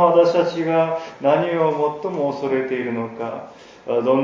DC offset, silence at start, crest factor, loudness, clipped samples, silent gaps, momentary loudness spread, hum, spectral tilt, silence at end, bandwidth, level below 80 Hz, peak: under 0.1%; 0 s; 18 dB; -20 LUFS; under 0.1%; none; 12 LU; none; -7 dB/octave; 0 s; 7.4 kHz; -66 dBFS; -2 dBFS